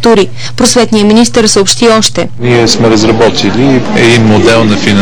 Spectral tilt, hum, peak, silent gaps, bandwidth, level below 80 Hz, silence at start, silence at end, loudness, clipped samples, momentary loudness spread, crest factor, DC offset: -4 dB/octave; none; 0 dBFS; none; 11 kHz; -32 dBFS; 0 s; 0 s; -6 LUFS; 2%; 4 LU; 6 dB; 10%